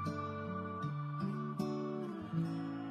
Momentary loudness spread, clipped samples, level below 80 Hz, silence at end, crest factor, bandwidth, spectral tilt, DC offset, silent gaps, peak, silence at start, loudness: 3 LU; under 0.1%; -74 dBFS; 0 s; 14 dB; 13 kHz; -8 dB/octave; under 0.1%; none; -26 dBFS; 0 s; -40 LUFS